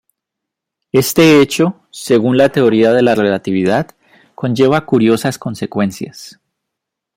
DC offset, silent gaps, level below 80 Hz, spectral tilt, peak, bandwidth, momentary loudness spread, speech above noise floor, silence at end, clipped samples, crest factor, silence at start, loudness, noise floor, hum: under 0.1%; none; -54 dBFS; -5.5 dB/octave; 0 dBFS; 16.5 kHz; 13 LU; 68 dB; 0.85 s; under 0.1%; 14 dB; 0.95 s; -13 LUFS; -80 dBFS; none